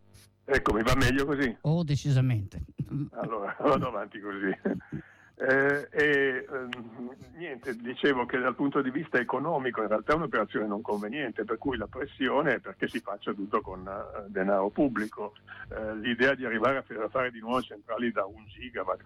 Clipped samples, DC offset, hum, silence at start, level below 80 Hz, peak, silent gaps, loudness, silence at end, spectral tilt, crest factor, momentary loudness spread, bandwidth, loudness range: under 0.1%; under 0.1%; none; 0.15 s; -50 dBFS; -14 dBFS; none; -29 LUFS; 0 s; -6.5 dB/octave; 16 dB; 13 LU; 16 kHz; 3 LU